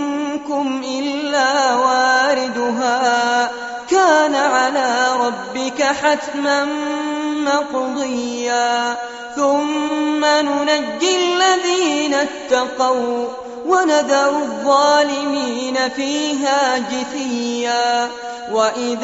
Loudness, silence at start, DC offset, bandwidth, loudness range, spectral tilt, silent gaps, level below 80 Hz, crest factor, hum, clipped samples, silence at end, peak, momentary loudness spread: -17 LUFS; 0 s; under 0.1%; 8 kHz; 3 LU; 0 dB/octave; none; -62 dBFS; 16 dB; none; under 0.1%; 0 s; -2 dBFS; 8 LU